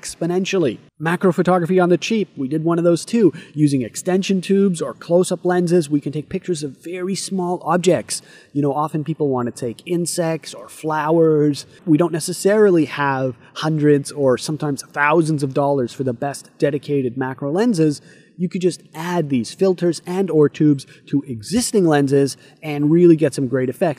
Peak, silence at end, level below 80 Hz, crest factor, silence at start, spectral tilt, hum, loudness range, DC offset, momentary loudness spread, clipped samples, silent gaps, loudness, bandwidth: -2 dBFS; 0.05 s; -60 dBFS; 16 dB; 0.05 s; -6 dB/octave; none; 4 LU; under 0.1%; 10 LU; under 0.1%; none; -19 LUFS; 15.5 kHz